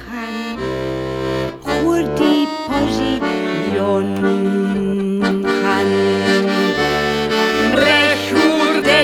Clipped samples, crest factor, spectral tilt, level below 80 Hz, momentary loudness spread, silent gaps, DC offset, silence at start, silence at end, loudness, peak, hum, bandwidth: under 0.1%; 16 dB; -5 dB/octave; -42 dBFS; 9 LU; none; under 0.1%; 0 s; 0 s; -16 LUFS; -2 dBFS; none; 18.5 kHz